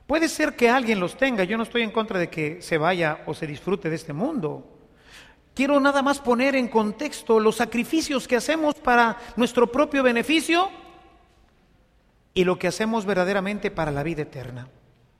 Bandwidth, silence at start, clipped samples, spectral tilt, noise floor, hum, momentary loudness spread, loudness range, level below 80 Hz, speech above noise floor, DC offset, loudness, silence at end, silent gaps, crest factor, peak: 15.5 kHz; 0.1 s; under 0.1%; -5 dB/octave; -61 dBFS; none; 10 LU; 5 LU; -52 dBFS; 38 dB; under 0.1%; -23 LUFS; 0.5 s; none; 18 dB; -4 dBFS